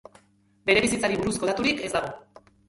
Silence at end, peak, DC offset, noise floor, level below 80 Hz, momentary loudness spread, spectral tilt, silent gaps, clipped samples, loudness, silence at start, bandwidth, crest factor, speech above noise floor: 0.5 s; -6 dBFS; under 0.1%; -61 dBFS; -52 dBFS; 11 LU; -3.5 dB/octave; none; under 0.1%; -24 LUFS; 0.65 s; 11.5 kHz; 22 dB; 37 dB